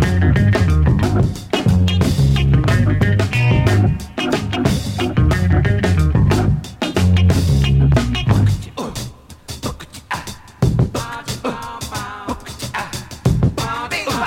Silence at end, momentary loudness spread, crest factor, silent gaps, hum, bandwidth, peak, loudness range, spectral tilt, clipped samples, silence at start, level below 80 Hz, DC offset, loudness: 0 s; 13 LU; 16 dB; none; none; 16 kHz; 0 dBFS; 8 LU; -6.5 dB/octave; under 0.1%; 0 s; -26 dBFS; under 0.1%; -17 LUFS